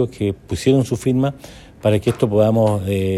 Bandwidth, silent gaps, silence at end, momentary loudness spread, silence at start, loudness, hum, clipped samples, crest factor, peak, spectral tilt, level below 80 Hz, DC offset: 14 kHz; none; 0 s; 7 LU; 0 s; -18 LUFS; none; under 0.1%; 16 dB; -2 dBFS; -7 dB/octave; -46 dBFS; under 0.1%